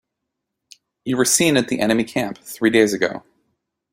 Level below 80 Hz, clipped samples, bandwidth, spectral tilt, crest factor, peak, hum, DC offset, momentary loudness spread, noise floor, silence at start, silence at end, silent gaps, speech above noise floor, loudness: -58 dBFS; under 0.1%; 16.5 kHz; -3.5 dB/octave; 20 dB; -2 dBFS; none; under 0.1%; 12 LU; -80 dBFS; 1.05 s; 0.75 s; none; 61 dB; -18 LUFS